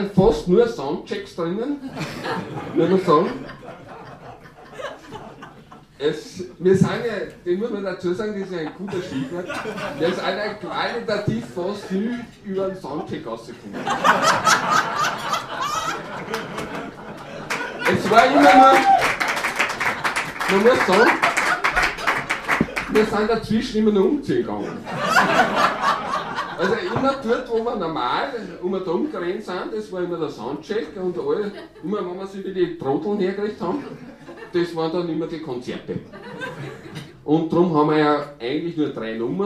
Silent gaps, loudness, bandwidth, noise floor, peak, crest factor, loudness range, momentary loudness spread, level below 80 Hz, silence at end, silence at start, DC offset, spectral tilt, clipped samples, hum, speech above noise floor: none; -21 LUFS; 15.5 kHz; -45 dBFS; 0 dBFS; 22 dB; 10 LU; 16 LU; -48 dBFS; 0 s; 0 s; under 0.1%; -5 dB/octave; under 0.1%; none; 24 dB